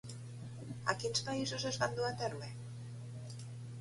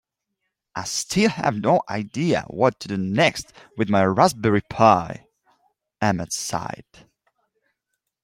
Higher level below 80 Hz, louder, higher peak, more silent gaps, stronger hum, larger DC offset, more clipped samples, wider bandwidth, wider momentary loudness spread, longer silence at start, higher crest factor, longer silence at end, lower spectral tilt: second, -68 dBFS vs -56 dBFS; second, -40 LUFS vs -21 LUFS; second, -16 dBFS vs -2 dBFS; neither; neither; neither; neither; second, 11.5 kHz vs 16 kHz; second, 12 LU vs 17 LU; second, 0.05 s vs 0.75 s; about the same, 24 dB vs 20 dB; second, 0 s vs 1.5 s; about the same, -4 dB/octave vs -5 dB/octave